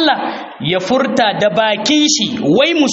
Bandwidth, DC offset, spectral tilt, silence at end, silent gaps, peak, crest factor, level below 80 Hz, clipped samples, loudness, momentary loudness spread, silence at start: 8 kHz; under 0.1%; -3.5 dB/octave; 0 s; none; 0 dBFS; 14 dB; -56 dBFS; under 0.1%; -14 LUFS; 7 LU; 0 s